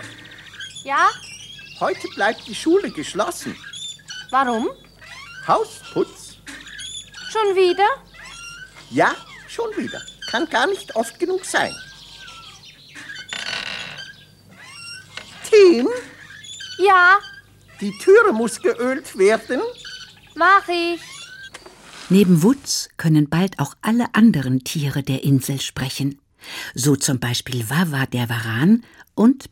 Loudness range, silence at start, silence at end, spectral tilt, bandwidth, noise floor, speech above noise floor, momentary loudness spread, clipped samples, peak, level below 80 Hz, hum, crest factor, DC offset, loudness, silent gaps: 7 LU; 0 s; 0.05 s; -5 dB/octave; 17 kHz; -46 dBFS; 28 dB; 22 LU; under 0.1%; -2 dBFS; -56 dBFS; none; 18 dB; under 0.1%; -19 LUFS; none